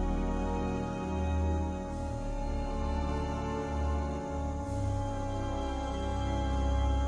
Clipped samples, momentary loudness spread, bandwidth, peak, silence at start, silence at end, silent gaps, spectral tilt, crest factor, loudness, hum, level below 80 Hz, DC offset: under 0.1%; 5 LU; 10 kHz; -20 dBFS; 0 s; 0 s; none; -7 dB/octave; 12 dB; -34 LUFS; none; -34 dBFS; under 0.1%